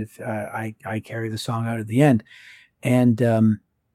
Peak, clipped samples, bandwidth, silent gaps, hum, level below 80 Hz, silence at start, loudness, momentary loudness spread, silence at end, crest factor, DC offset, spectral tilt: -4 dBFS; under 0.1%; 14.5 kHz; none; none; -64 dBFS; 0 s; -22 LUFS; 12 LU; 0.35 s; 18 dB; under 0.1%; -7.5 dB/octave